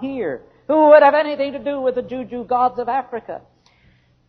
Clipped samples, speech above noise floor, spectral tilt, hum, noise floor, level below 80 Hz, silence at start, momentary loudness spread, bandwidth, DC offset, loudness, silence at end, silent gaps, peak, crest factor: under 0.1%; 38 dB; -7.5 dB/octave; none; -56 dBFS; -58 dBFS; 0 s; 20 LU; 4.9 kHz; under 0.1%; -17 LUFS; 0.9 s; none; 0 dBFS; 18 dB